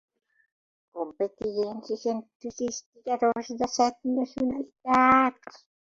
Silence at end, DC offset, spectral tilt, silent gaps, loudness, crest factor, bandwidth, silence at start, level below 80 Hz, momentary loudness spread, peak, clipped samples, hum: 0.35 s; under 0.1%; -4 dB/octave; 2.35-2.40 s, 2.86-2.93 s; -27 LUFS; 20 dB; 7.6 kHz; 0.95 s; -62 dBFS; 15 LU; -6 dBFS; under 0.1%; none